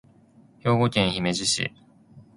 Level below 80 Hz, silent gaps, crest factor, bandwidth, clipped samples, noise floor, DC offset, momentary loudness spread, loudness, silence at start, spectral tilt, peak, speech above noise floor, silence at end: -54 dBFS; none; 22 dB; 11.5 kHz; under 0.1%; -55 dBFS; under 0.1%; 8 LU; -24 LUFS; 0.65 s; -4 dB/octave; -4 dBFS; 32 dB; 0.15 s